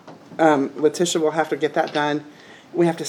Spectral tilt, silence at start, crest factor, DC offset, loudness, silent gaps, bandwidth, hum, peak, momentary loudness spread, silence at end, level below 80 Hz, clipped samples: -4.5 dB/octave; 0.05 s; 18 dB; under 0.1%; -21 LUFS; none; 15.5 kHz; none; -2 dBFS; 9 LU; 0 s; -78 dBFS; under 0.1%